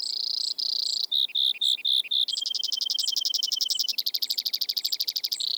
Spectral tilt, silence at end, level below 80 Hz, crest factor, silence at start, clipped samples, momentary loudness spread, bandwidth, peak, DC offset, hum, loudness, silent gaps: 4.5 dB/octave; 0 s; under -90 dBFS; 14 dB; 0 s; under 0.1%; 4 LU; over 20 kHz; -14 dBFS; under 0.1%; none; -24 LUFS; none